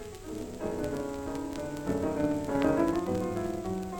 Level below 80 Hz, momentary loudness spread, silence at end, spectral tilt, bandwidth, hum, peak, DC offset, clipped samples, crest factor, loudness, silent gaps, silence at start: -48 dBFS; 9 LU; 0 s; -6.5 dB/octave; over 20 kHz; none; -12 dBFS; under 0.1%; under 0.1%; 18 dB; -32 LUFS; none; 0 s